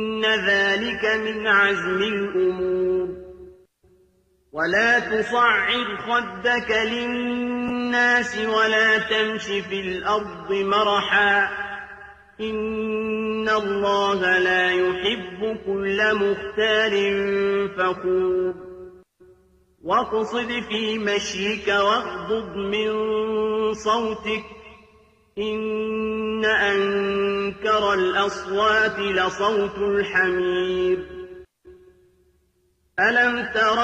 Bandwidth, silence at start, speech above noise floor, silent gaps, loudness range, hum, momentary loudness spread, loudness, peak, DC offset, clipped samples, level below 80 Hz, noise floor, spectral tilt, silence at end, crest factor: 8.8 kHz; 0 s; 44 dB; none; 4 LU; none; 9 LU; -21 LUFS; -8 dBFS; under 0.1%; under 0.1%; -52 dBFS; -66 dBFS; -4 dB/octave; 0 s; 16 dB